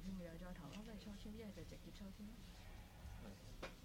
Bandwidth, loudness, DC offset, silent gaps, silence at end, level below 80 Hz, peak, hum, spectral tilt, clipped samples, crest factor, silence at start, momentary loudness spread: 17 kHz; -56 LUFS; under 0.1%; none; 0 s; -60 dBFS; -38 dBFS; none; -5.5 dB/octave; under 0.1%; 16 dB; 0 s; 5 LU